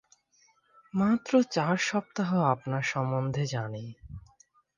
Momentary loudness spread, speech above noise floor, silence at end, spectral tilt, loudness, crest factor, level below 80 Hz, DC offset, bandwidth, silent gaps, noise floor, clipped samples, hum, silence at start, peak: 17 LU; 39 dB; 0.6 s; -6 dB/octave; -28 LUFS; 20 dB; -60 dBFS; under 0.1%; 9.8 kHz; none; -67 dBFS; under 0.1%; none; 0.95 s; -10 dBFS